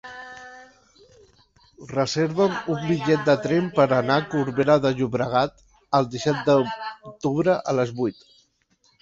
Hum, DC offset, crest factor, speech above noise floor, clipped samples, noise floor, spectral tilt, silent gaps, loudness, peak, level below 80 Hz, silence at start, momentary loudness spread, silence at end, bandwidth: none; under 0.1%; 20 dB; 43 dB; under 0.1%; -64 dBFS; -6 dB/octave; none; -22 LUFS; -4 dBFS; -58 dBFS; 0.05 s; 11 LU; 0.9 s; 7.8 kHz